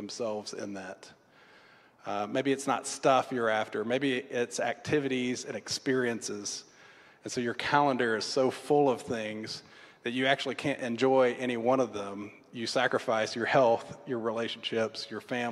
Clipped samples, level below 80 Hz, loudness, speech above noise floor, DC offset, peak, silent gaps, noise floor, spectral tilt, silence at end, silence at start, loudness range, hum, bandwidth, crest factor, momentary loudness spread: under 0.1%; -74 dBFS; -30 LUFS; 29 dB; under 0.1%; -10 dBFS; none; -59 dBFS; -4 dB/octave; 0 s; 0 s; 3 LU; none; 13 kHz; 20 dB; 13 LU